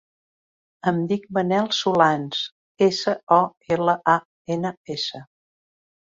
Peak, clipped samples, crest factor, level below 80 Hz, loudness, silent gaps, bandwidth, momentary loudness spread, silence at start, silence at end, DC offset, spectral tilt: -2 dBFS; under 0.1%; 20 dB; -64 dBFS; -22 LUFS; 2.52-2.75 s, 3.23-3.27 s, 3.57-3.61 s, 4.25-4.45 s, 4.77-4.85 s; 7.8 kHz; 10 LU; 0.85 s; 0.8 s; under 0.1%; -5 dB/octave